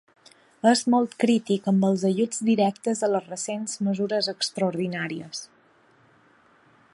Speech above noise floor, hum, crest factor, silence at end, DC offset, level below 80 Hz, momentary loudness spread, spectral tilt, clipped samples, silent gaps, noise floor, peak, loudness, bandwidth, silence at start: 35 dB; none; 20 dB; 1.5 s; under 0.1%; -74 dBFS; 9 LU; -5 dB/octave; under 0.1%; none; -59 dBFS; -6 dBFS; -24 LUFS; 11.5 kHz; 0.65 s